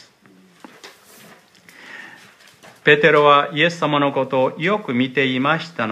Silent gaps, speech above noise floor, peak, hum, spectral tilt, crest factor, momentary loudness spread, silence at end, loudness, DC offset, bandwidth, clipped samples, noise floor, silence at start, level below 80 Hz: none; 34 dB; 0 dBFS; none; -5.5 dB/octave; 20 dB; 18 LU; 0 s; -17 LUFS; under 0.1%; 14 kHz; under 0.1%; -51 dBFS; 0.85 s; -68 dBFS